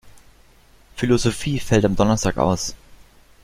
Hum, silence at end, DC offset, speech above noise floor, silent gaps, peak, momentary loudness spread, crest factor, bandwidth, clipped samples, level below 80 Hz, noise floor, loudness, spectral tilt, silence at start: none; 0.5 s; under 0.1%; 33 dB; none; -2 dBFS; 8 LU; 20 dB; 16 kHz; under 0.1%; -38 dBFS; -52 dBFS; -20 LUFS; -5.5 dB/octave; 0.05 s